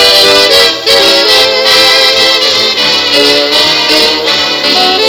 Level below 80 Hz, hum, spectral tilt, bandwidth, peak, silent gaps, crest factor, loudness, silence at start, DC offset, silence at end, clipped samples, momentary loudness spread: -42 dBFS; none; -1 dB/octave; over 20 kHz; 0 dBFS; none; 6 dB; -4 LUFS; 0 s; under 0.1%; 0 s; 6%; 4 LU